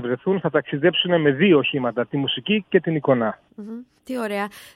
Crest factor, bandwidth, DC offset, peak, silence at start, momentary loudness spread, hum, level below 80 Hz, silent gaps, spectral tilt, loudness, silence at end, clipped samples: 18 dB; 14 kHz; under 0.1%; -4 dBFS; 0 s; 18 LU; none; -64 dBFS; none; -7 dB/octave; -21 LUFS; 0.1 s; under 0.1%